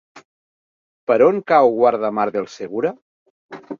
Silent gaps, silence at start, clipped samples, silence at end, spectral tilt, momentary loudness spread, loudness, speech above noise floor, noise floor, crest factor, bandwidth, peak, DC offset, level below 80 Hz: 0.25-1.07 s, 3.02-3.49 s; 0.15 s; under 0.1%; 0.05 s; -6.5 dB/octave; 12 LU; -18 LUFS; over 73 dB; under -90 dBFS; 18 dB; 7.2 kHz; -2 dBFS; under 0.1%; -66 dBFS